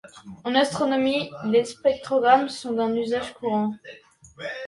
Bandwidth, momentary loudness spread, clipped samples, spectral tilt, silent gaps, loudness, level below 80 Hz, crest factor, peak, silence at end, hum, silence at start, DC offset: 11.5 kHz; 15 LU; under 0.1%; -4.5 dB/octave; none; -23 LUFS; -62 dBFS; 20 dB; -4 dBFS; 0 s; none; 0.05 s; under 0.1%